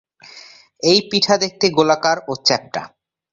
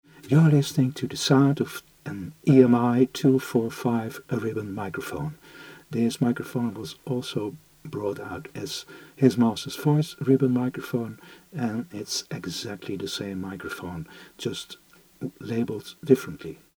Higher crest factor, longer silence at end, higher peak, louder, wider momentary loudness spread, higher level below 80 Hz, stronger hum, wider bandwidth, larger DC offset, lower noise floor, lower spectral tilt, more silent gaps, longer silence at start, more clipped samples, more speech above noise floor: about the same, 18 dB vs 22 dB; first, 0.45 s vs 0.2 s; about the same, -2 dBFS vs -4 dBFS; first, -16 LUFS vs -25 LUFS; second, 7 LU vs 17 LU; about the same, -62 dBFS vs -62 dBFS; neither; second, 7.8 kHz vs over 20 kHz; neither; second, -43 dBFS vs -47 dBFS; second, -3.5 dB/octave vs -6.5 dB/octave; neither; about the same, 0.35 s vs 0.25 s; neither; first, 26 dB vs 22 dB